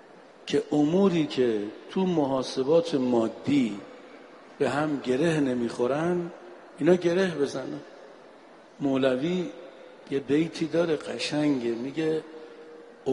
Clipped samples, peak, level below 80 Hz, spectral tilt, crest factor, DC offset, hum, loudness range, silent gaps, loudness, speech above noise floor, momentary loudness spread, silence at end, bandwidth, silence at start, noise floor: under 0.1%; -8 dBFS; -66 dBFS; -6.5 dB/octave; 18 dB; under 0.1%; none; 4 LU; none; -26 LUFS; 25 dB; 20 LU; 0 s; 11.5 kHz; 0.15 s; -51 dBFS